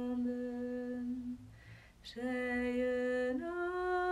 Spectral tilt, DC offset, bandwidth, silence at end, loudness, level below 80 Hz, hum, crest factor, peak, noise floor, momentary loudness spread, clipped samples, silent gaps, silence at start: -6 dB/octave; under 0.1%; 11 kHz; 0 s; -37 LUFS; -62 dBFS; none; 12 dB; -26 dBFS; -57 dBFS; 16 LU; under 0.1%; none; 0 s